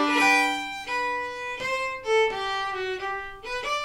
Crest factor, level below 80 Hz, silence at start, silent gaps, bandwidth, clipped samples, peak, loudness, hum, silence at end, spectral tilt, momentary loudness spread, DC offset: 16 dB; -54 dBFS; 0 s; none; 17.5 kHz; under 0.1%; -10 dBFS; -26 LUFS; none; 0 s; -2 dB/octave; 12 LU; under 0.1%